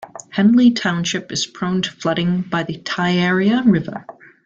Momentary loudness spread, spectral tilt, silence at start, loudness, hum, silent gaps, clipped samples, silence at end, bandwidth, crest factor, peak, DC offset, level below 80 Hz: 10 LU; -5 dB/octave; 0 s; -18 LUFS; none; none; under 0.1%; 0.35 s; 8 kHz; 14 dB; -4 dBFS; under 0.1%; -56 dBFS